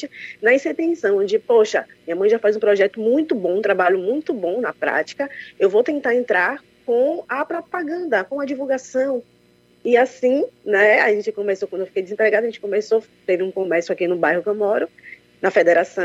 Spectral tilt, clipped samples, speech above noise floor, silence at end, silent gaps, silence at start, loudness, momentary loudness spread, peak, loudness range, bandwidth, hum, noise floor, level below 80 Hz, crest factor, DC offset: -5 dB/octave; under 0.1%; 36 dB; 0 s; none; 0 s; -19 LUFS; 9 LU; -2 dBFS; 3 LU; 8 kHz; none; -56 dBFS; -72 dBFS; 16 dB; under 0.1%